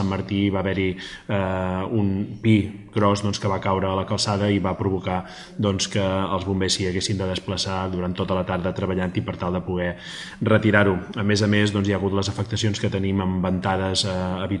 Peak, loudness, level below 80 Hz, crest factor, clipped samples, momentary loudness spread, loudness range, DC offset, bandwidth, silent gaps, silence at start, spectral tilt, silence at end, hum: 0 dBFS; -23 LUFS; -52 dBFS; 22 dB; under 0.1%; 7 LU; 3 LU; under 0.1%; 11.5 kHz; none; 0 s; -5.5 dB/octave; 0 s; none